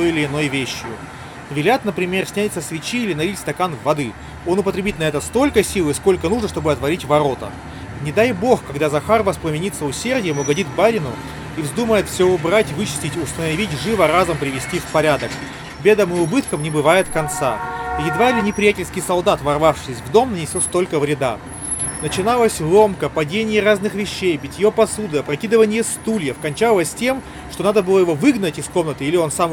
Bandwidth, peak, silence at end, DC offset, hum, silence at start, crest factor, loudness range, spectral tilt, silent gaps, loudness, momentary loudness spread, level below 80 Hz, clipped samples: 19 kHz; 0 dBFS; 0 s; under 0.1%; none; 0 s; 18 dB; 3 LU; -4.5 dB/octave; none; -18 LUFS; 9 LU; -44 dBFS; under 0.1%